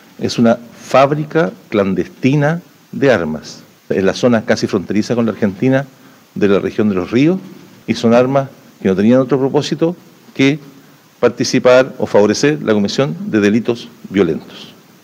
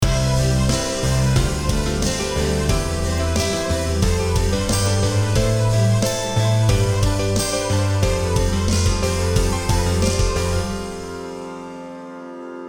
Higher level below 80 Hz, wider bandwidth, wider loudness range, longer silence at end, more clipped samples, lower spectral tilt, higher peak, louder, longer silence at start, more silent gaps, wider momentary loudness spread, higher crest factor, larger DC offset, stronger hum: second, -54 dBFS vs -26 dBFS; second, 16 kHz vs over 20 kHz; about the same, 2 LU vs 3 LU; first, 0.35 s vs 0 s; neither; about the same, -6 dB/octave vs -5 dB/octave; first, 0 dBFS vs -4 dBFS; first, -15 LUFS vs -20 LUFS; first, 0.2 s vs 0 s; neither; about the same, 12 LU vs 12 LU; about the same, 14 dB vs 14 dB; neither; neither